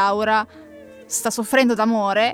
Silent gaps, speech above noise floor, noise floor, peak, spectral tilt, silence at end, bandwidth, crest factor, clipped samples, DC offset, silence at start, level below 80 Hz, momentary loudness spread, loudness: none; 23 dB; -42 dBFS; -4 dBFS; -3 dB/octave; 0 s; 17 kHz; 16 dB; under 0.1%; under 0.1%; 0 s; -62 dBFS; 7 LU; -19 LUFS